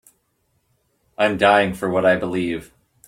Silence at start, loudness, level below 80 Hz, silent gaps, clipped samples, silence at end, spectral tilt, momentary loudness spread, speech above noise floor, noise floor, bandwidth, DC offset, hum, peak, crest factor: 1.2 s; -19 LUFS; -54 dBFS; none; under 0.1%; 0.45 s; -5.5 dB/octave; 10 LU; 50 dB; -68 dBFS; 15.5 kHz; under 0.1%; none; -2 dBFS; 18 dB